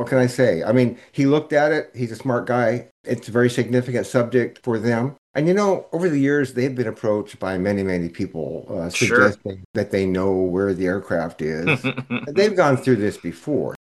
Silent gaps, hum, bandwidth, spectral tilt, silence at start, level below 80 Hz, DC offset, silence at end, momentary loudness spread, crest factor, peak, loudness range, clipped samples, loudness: 2.91-3.04 s, 5.18-5.34 s, 9.65-9.74 s; none; 12.5 kHz; -6.5 dB/octave; 0 s; -60 dBFS; under 0.1%; 0.2 s; 10 LU; 18 dB; -2 dBFS; 1 LU; under 0.1%; -21 LUFS